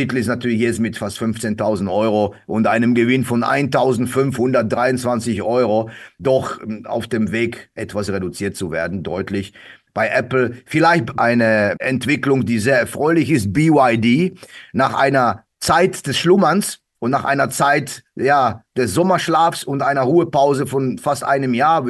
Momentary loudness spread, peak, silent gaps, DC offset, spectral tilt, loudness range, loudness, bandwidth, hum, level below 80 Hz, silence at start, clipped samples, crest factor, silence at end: 9 LU; 0 dBFS; none; under 0.1%; -5.5 dB/octave; 6 LU; -17 LUFS; 12.5 kHz; none; -48 dBFS; 0 s; under 0.1%; 16 dB; 0 s